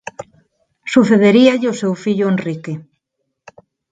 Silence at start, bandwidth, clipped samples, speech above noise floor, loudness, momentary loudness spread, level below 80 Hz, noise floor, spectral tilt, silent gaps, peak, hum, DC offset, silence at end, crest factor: 0.2 s; 9.2 kHz; under 0.1%; 60 dB; -14 LUFS; 21 LU; -60 dBFS; -74 dBFS; -6.5 dB/octave; none; 0 dBFS; none; under 0.1%; 1.1 s; 16 dB